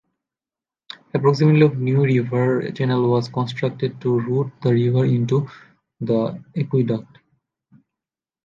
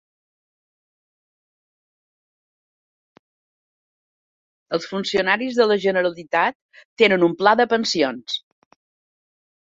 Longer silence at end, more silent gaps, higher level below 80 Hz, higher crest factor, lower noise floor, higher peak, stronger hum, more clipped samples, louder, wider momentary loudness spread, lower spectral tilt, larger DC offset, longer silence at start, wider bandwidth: about the same, 1.45 s vs 1.35 s; second, none vs 6.55-6.69 s, 6.85-6.96 s; first, -62 dBFS vs -68 dBFS; second, 18 dB vs 24 dB; about the same, under -90 dBFS vs under -90 dBFS; second, -4 dBFS vs 0 dBFS; neither; neither; about the same, -20 LUFS vs -20 LUFS; about the same, 11 LU vs 11 LU; first, -9 dB/octave vs -4 dB/octave; neither; second, 1.15 s vs 4.7 s; about the same, 7.4 kHz vs 7.8 kHz